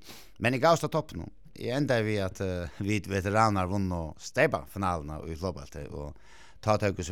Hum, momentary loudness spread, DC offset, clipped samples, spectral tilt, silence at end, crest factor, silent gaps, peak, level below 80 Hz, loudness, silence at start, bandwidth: none; 16 LU; 0.3%; under 0.1%; -6 dB/octave; 0 s; 20 dB; none; -10 dBFS; -52 dBFS; -29 LUFS; 0.05 s; 17 kHz